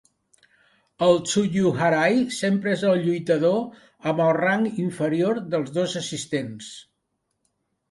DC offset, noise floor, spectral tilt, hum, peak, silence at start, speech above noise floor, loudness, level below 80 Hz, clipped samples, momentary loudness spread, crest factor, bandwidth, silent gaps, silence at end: under 0.1%; -76 dBFS; -5.5 dB/octave; none; -6 dBFS; 1 s; 54 dB; -23 LUFS; -64 dBFS; under 0.1%; 9 LU; 18 dB; 11.5 kHz; none; 1.1 s